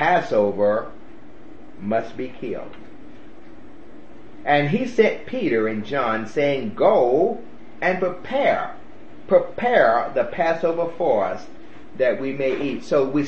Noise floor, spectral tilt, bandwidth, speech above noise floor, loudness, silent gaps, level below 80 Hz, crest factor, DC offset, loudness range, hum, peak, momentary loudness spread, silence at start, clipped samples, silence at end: -45 dBFS; -6.5 dB/octave; 8 kHz; 24 dB; -21 LUFS; none; -56 dBFS; 20 dB; 2%; 7 LU; none; -2 dBFS; 14 LU; 0 s; under 0.1%; 0 s